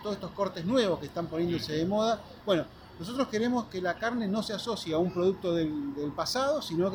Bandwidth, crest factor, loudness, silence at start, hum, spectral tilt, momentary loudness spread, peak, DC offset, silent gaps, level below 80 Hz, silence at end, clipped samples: over 20 kHz; 16 dB; -30 LUFS; 0 s; none; -5.5 dB/octave; 6 LU; -14 dBFS; under 0.1%; none; -58 dBFS; 0 s; under 0.1%